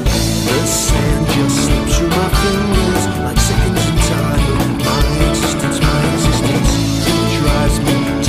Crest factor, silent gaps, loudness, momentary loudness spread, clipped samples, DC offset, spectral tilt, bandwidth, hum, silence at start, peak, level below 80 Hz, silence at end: 14 dB; none; -14 LUFS; 2 LU; under 0.1%; under 0.1%; -4.5 dB/octave; 15.5 kHz; none; 0 s; 0 dBFS; -20 dBFS; 0 s